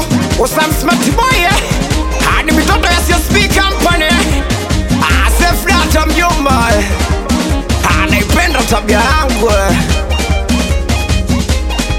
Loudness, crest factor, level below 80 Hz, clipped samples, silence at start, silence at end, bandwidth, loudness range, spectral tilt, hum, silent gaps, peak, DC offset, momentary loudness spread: -11 LUFS; 10 dB; -16 dBFS; under 0.1%; 0 s; 0 s; 17 kHz; 1 LU; -4.5 dB/octave; none; none; 0 dBFS; under 0.1%; 4 LU